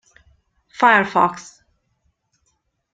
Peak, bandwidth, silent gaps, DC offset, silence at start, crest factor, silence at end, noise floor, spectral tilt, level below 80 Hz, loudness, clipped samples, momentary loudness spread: -2 dBFS; 9.2 kHz; none; under 0.1%; 0.8 s; 22 dB; 1.55 s; -69 dBFS; -4.5 dB/octave; -64 dBFS; -16 LUFS; under 0.1%; 23 LU